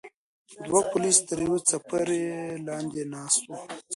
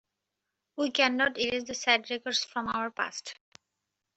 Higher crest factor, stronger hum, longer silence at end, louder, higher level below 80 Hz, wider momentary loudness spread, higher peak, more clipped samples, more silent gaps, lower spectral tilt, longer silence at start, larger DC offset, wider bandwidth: about the same, 22 dB vs 22 dB; neither; second, 0 s vs 0.85 s; about the same, -26 LUFS vs -28 LUFS; about the same, -64 dBFS vs -68 dBFS; first, 13 LU vs 10 LU; first, -6 dBFS vs -10 dBFS; neither; first, 0.14-0.46 s vs none; first, -3 dB/octave vs -1.5 dB/octave; second, 0.05 s vs 0.75 s; neither; first, 11.5 kHz vs 8.2 kHz